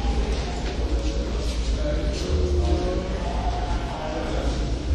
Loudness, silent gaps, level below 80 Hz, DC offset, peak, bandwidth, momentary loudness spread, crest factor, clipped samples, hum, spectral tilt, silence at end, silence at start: -26 LUFS; none; -26 dBFS; under 0.1%; -10 dBFS; 9.6 kHz; 5 LU; 14 dB; under 0.1%; none; -6 dB/octave; 0 s; 0 s